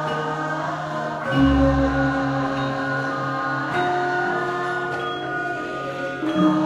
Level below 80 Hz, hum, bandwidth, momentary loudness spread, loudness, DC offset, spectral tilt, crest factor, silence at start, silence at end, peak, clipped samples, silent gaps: -36 dBFS; none; 10.5 kHz; 8 LU; -23 LUFS; under 0.1%; -6.5 dB/octave; 16 dB; 0 s; 0 s; -8 dBFS; under 0.1%; none